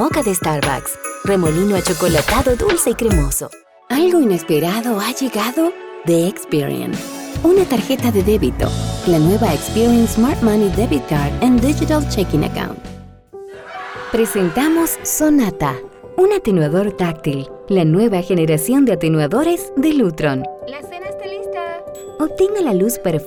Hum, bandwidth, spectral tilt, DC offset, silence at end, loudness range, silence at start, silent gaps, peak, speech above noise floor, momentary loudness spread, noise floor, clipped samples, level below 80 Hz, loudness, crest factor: none; over 20 kHz; -5.5 dB/octave; under 0.1%; 0 s; 4 LU; 0 s; none; -4 dBFS; 20 dB; 13 LU; -36 dBFS; under 0.1%; -32 dBFS; -16 LUFS; 12 dB